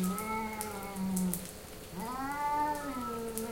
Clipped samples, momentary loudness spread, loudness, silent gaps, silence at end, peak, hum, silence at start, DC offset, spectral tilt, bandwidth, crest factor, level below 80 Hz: under 0.1%; 9 LU; -36 LUFS; none; 0 s; -10 dBFS; none; 0 s; under 0.1%; -5 dB/octave; 17 kHz; 26 dB; -56 dBFS